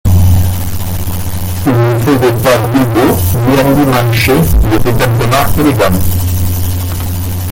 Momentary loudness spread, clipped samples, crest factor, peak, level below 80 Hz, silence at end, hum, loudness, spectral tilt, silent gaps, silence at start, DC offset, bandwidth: 8 LU; under 0.1%; 10 dB; 0 dBFS; -20 dBFS; 0 s; none; -11 LUFS; -6 dB/octave; none; 0.05 s; under 0.1%; 17 kHz